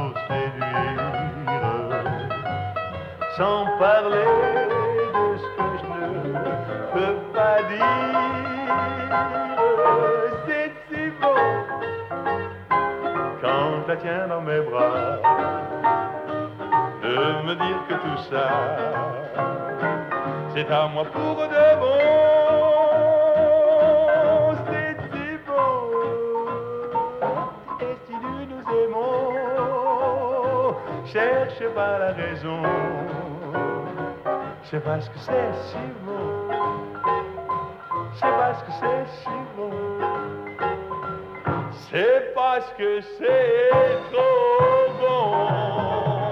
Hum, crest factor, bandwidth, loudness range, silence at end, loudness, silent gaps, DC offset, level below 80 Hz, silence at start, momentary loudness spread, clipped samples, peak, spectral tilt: none; 16 dB; 6.2 kHz; 8 LU; 0 s; -23 LUFS; none; under 0.1%; -56 dBFS; 0 s; 12 LU; under 0.1%; -8 dBFS; -7.5 dB/octave